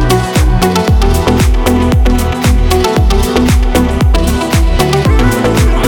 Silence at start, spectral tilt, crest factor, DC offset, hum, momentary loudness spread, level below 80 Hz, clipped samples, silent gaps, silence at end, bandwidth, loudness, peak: 0 s; -5.5 dB/octave; 8 dB; under 0.1%; none; 2 LU; -12 dBFS; under 0.1%; none; 0 s; 19.5 kHz; -11 LUFS; 0 dBFS